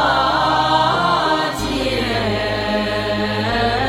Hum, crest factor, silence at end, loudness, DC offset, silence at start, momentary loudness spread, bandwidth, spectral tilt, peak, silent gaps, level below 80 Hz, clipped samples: none; 14 dB; 0 s; -17 LUFS; under 0.1%; 0 s; 5 LU; 16.5 kHz; -5 dB/octave; -4 dBFS; none; -36 dBFS; under 0.1%